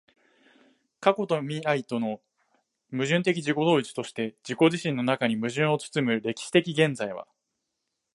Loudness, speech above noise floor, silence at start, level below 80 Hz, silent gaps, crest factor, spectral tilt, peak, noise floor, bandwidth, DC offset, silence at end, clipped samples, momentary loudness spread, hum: -26 LUFS; 56 dB; 1 s; -74 dBFS; none; 22 dB; -5.5 dB/octave; -4 dBFS; -81 dBFS; 11.5 kHz; under 0.1%; 0.95 s; under 0.1%; 10 LU; none